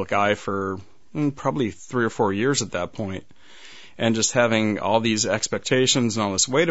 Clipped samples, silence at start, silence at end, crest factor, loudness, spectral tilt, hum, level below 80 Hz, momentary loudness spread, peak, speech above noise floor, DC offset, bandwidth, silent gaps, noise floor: under 0.1%; 0 s; 0 s; 20 dB; -22 LUFS; -3.5 dB/octave; none; -58 dBFS; 10 LU; -4 dBFS; 24 dB; 0.6%; 8.2 kHz; none; -47 dBFS